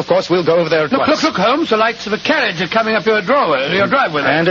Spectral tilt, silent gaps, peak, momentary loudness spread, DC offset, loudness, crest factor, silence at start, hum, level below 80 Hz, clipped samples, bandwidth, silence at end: -5 dB/octave; none; 0 dBFS; 2 LU; under 0.1%; -14 LUFS; 14 dB; 0 s; none; -52 dBFS; under 0.1%; 7.6 kHz; 0 s